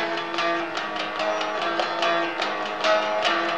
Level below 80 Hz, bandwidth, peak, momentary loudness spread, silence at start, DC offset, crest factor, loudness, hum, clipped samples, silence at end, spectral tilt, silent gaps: -70 dBFS; 10 kHz; -8 dBFS; 5 LU; 0 s; 0.3%; 16 dB; -24 LUFS; none; under 0.1%; 0 s; -2.5 dB/octave; none